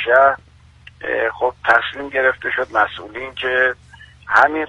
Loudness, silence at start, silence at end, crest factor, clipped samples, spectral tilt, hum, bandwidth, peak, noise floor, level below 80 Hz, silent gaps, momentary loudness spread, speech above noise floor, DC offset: -17 LUFS; 0 s; 0 s; 18 dB; under 0.1%; -4.5 dB/octave; none; 10 kHz; 0 dBFS; -45 dBFS; -50 dBFS; none; 15 LU; 28 dB; under 0.1%